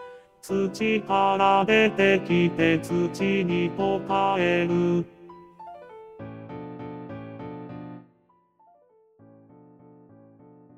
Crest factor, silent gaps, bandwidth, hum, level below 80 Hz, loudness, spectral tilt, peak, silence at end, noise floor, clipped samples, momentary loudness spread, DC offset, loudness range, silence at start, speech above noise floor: 20 dB; none; 13.5 kHz; none; -60 dBFS; -23 LUFS; -6.5 dB/octave; -6 dBFS; 2.8 s; -64 dBFS; under 0.1%; 23 LU; under 0.1%; 20 LU; 0 s; 41 dB